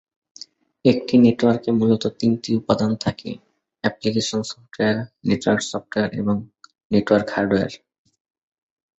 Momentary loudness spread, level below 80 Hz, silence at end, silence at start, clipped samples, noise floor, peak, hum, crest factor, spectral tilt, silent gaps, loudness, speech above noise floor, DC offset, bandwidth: 17 LU; -54 dBFS; 1.25 s; 0.85 s; under 0.1%; -45 dBFS; -2 dBFS; none; 20 dB; -6 dB/octave; 6.85-6.90 s; -21 LUFS; 25 dB; under 0.1%; 8 kHz